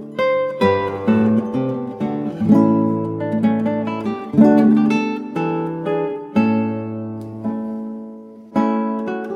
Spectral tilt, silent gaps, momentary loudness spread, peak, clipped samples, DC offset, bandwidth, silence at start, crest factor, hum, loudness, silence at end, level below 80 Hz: -8.5 dB/octave; none; 13 LU; -2 dBFS; under 0.1%; under 0.1%; 6.6 kHz; 0 s; 18 dB; none; -19 LUFS; 0 s; -58 dBFS